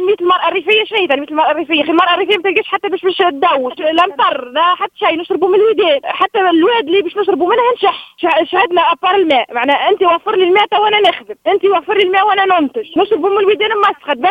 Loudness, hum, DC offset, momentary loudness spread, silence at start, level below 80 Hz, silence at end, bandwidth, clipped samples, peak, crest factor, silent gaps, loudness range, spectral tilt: -12 LUFS; none; under 0.1%; 4 LU; 0 s; -62 dBFS; 0 s; 5.4 kHz; under 0.1%; 0 dBFS; 12 dB; none; 1 LU; -4.5 dB/octave